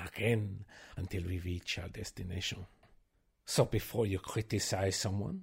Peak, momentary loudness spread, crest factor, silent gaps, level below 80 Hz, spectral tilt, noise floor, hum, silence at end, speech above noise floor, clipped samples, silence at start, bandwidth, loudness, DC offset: -16 dBFS; 13 LU; 22 dB; none; -54 dBFS; -4.5 dB/octave; -71 dBFS; none; 0 s; 36 dB; under 0.1%; 0 s; 16 kHz; -36 LUFS; under 0.1%